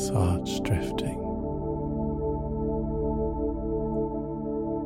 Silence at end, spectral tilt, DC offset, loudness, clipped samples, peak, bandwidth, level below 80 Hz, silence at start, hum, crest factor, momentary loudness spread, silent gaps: 0 s; -7 dB/octave; under 0.1%; -30 LUFS; under 0.1%; -14 dBFS; 16 kHz; -38 dBFS; 0 s; none; 14 dB; 5 LU; none